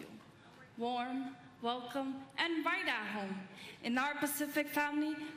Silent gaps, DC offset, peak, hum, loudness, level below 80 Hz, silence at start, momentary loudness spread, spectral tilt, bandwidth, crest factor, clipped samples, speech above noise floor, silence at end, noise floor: none; under 0.1%; -20 dBFS; none; -37 LUFS; -80 dBFS; 0 s; 12 LU; -3 dB/octave; 15.5 kHz; 20 dB; under 0.1%; 21 dB; 0 s; -59 dBFS